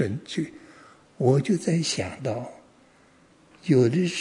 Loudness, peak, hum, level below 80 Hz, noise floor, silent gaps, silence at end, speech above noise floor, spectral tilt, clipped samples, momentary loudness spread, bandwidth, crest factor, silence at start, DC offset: -25 LUFS; -8 dBFS; none; -68 dBFS; -57 dBFS; none; 0 s; 33 dB; -6 dB/octave; under 0.1%; 14 LU; 11 kHz; 18 dB; 0 s; under 0.1%